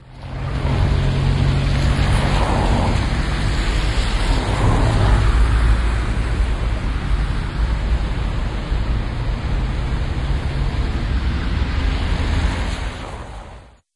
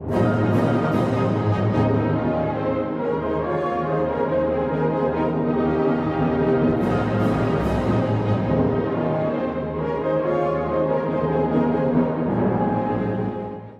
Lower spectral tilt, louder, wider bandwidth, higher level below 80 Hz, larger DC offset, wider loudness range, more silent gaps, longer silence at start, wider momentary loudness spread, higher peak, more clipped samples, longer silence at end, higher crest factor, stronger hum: second, -6 dB/octave vs -9 dB/octave; about the same, -21 LUFS vs -22 LUFS; first, 11.5 kHz vs 8.6 kHz; first, -20 dBFS vs -42 dBFS; neither; first, 4 LU vs 1 LU; neither; about the same, 0.05 s vs 0 s; first, 7 LU vs 4 LU; first, -4 dBFS vs -8 dBFS; neither; first, 0.3 s vs 0 s; about the same, 14 dB vs 14 dB; neither